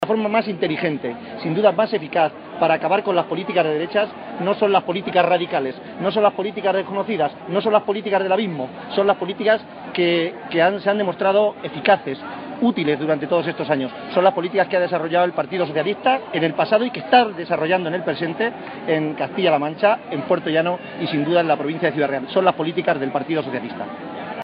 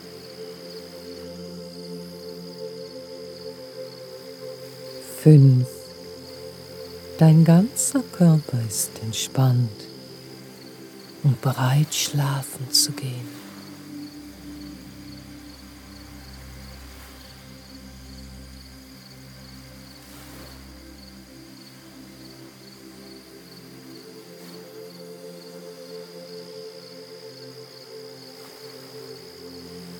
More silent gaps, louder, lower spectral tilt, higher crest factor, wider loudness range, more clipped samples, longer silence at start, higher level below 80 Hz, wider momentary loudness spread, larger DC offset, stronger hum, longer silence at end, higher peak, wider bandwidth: neither; about the same, -20 LUFS vs -20 LUFS; second, -3.5 dB/octave vs -5.5 dB/octave; second, 18 dB vs 24 dB; second, 1 LU vs 23 LU; neither; about the same, 0 s vs 0.05 s; second, -68 dBFS vs -54 dBFS; second, 7 LU vs 24 LU; neither; neither; about the same, 0 s vs 0 s; about the same, -2 dBFS vs -2 dBFS; second, 5.2 kHz vs 18.5 kHz